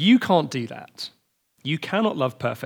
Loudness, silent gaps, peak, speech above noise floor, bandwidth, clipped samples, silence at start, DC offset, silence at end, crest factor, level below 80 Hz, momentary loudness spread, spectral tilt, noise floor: -23 LUFS; none; -6 dBFS; 28 dB; 18 kHz; under 0.1%; 0 s; under 0.1%; 0 s; 18 dB; -72 dBFS; 17 LU; -6 dB/octave; -51 dBFS